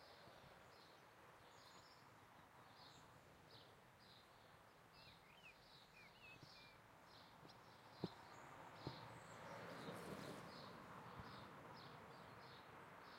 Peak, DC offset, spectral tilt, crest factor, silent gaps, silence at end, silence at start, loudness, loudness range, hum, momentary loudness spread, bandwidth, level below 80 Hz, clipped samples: -34 dBFS; under 0.1%; -5 dB/octave; 26 dB; none; 0 s; 0 s; -60 LUFS; 9 LU; none; 11 LU; 16 kHz; -84 dBFS; under 0.1%